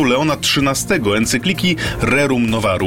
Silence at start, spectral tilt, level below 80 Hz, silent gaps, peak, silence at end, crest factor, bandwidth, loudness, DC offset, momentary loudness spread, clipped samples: 0 s; -4 dB/octave; -36 dBFS; none; -4 dBFS; 0 s; 12 dB; 16.5 kHz; -16 LUFS; under 0.1%; 2 LU; under 0.1%